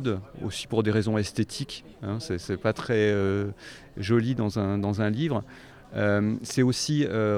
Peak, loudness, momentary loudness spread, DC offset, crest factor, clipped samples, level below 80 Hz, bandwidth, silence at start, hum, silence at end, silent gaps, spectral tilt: -10 dBFS; -27 LUFS; 11 LU; under 0.1%; 16 dB; under 0.1%; -54 dBFS; 14.5 kHz; 0 s; none; 0 s; none; -6 dB/octave